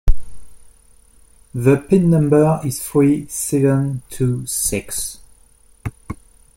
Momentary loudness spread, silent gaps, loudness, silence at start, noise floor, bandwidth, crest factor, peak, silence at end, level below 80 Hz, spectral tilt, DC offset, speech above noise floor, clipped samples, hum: 18 LU; none; -17 LUFS; 0.05 s; -50 dBFS; 16.5 kHz; 16 dB; -2 dBFS; 0.4 s; -28 dBFS; -6 dB/octave; under 0.1%; 34 dB; under 0.1%; none